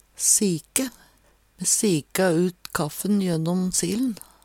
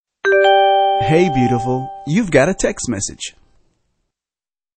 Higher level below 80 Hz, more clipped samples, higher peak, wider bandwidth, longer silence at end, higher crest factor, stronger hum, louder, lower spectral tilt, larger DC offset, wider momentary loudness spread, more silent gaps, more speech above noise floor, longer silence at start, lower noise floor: second, -58 dBFS vs -42 dBFS; neither; about the same, -2 dBFS vs 0 dBFS; first, 18.5 kHz vs 8.8 kHz; second, 0.3 s vs 1.45 s; first, 22 dB vs 16 dB; neither; second, -23 LUFS vs -15 LUFS; about the same, -4 dB/octave vs -5 dB/octave; neither; about the same, 9 LU vs 11 LU; neither; second, 36 dB vs over 74 dB; about the same, 0.2 s vs 0.25 s; second, -59 dBFS vs under -90 dBFS